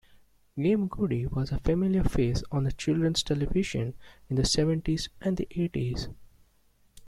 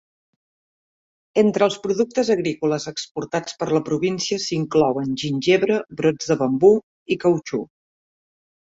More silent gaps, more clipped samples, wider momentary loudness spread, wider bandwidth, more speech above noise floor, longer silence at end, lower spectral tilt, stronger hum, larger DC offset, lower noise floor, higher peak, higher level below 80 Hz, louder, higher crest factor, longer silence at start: second, none vs 3.11-3.15 s, 6.83-7.06 s; neither; second, 7 LU vs 10 LU; first, 13.5 kHz vs 8 kHz; second, 36 dB vs over 70 dB; second, 0 s vs 1 s; about the same, -6 dB/octave vs -5 dB/octave; neither; neither; second, -64 dBFS vs under -90 dBFS; second, -10 dBFS vs -4 dBFS; first, -40 dBFS vs -60 dBFS; second, -29 LUFS vs -21 LUFS; about the same, 18 dB vs 18 dB; second, 0.55 s vs 1.35 s